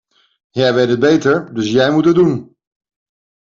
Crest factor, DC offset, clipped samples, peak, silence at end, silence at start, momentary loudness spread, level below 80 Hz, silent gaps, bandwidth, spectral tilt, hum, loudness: 14 dB; under 0.1%; under 0.1%; -2 dBFS; 1 s; 0.55 s; 5 LU; -54 dBFS; none; 7.6 kHz; -6.5 dB/octave; none; -14 LUFS